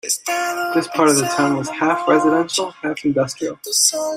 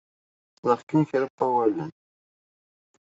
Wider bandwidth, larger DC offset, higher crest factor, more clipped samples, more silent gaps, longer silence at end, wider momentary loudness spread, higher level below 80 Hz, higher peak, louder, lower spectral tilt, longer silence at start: first, 16 kHz vs 7.8 kHz; neither; about the same, 18 dB vs 20 dB; neither; second, none vs 0.83-0.87 s, 1.30-1.38 s; second, 0 s vs 1.1 s; about the same, 7 LU vs 9 LU; first, -62 dBFS vs -72 dBFS; first, 0 dBFS vs -8 dBFS; first, -18 LUFS vs -25 LUFS; second, -3 dB/octave vs -8.5 dB/octave; second, 0.05 s vs 0.65 s